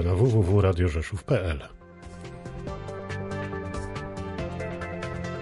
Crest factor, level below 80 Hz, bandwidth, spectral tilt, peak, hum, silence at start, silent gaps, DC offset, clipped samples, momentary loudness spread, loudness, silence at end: 16 dB; -36 dBFS; 11.5 kHz; -7.5 dB/octave; -12 dBFS; none; 0 s; none; under 0.1%; under 0.1%; 18 LU; -28 LUFS; 0 s